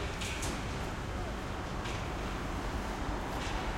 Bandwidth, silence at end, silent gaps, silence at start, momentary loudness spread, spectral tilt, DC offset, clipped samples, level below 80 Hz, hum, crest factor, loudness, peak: 16.5 kHz; 0 s; none; 0 s; 3 LU; -4.5 dB/octave; under 0.1%; under 0.1%; -42 dBFS; none; 14 dB; -37 LUFS; -22 dBFS